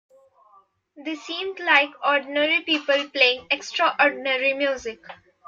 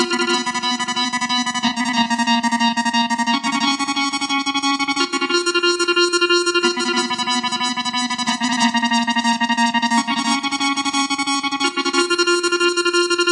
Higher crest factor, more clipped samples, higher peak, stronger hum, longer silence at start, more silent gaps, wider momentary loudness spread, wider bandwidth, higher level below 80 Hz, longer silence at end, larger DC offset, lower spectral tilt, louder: first, 20 dB vs 14 dB; neither; about the same, -4 dBFS vs -4 dBFS; neither; first, 0.95 s vs 0 s; neither; first, 14 LU vs 4 LU; second, 7.4 kHz vs 11.5 kHz; about the same, -68 dBFS vs -66 dBFS; first, 0.35 s vs 0 s; neither; about the same, -1.5 dB/octave vs -1.5 dB/octave; second, -21 LUFS vs -18 LUFS